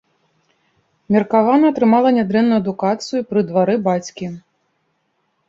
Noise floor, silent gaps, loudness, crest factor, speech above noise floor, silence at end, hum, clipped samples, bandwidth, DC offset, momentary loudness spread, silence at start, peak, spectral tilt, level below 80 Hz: -67 dBFS; none; -16 LUFS; 16 dB; 52 dB; 1.1 s; none; under 0.1%; 7.6 kHz; under 0.1%; 12 LU; 1.1 s; -2 dBFS; -7 dB/octave; -60 dBFS